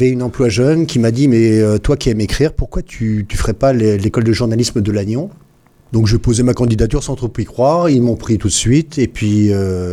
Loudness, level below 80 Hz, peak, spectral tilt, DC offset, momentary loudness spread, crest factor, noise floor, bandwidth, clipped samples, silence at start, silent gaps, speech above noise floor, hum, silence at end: -14 LUFS; -28 dBFS; -2 dBFS; -6 dB/octave; under 0.1%; 8 LU; 12 dB; -48 dBFS; 14 kHz; under 0.1%; 0 s; none; 35 dB; none; 0 s